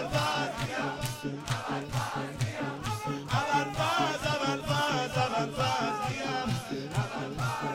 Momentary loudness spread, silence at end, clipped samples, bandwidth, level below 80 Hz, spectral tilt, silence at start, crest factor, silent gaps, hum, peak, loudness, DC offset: 6 LU; 0 s; under 0.1%; 16 kHz; -54 dBFS; -4.5 dB/octave; 0 s; 16 dB; none; none; -14 dBFS; -31 LUFS; under 0.1%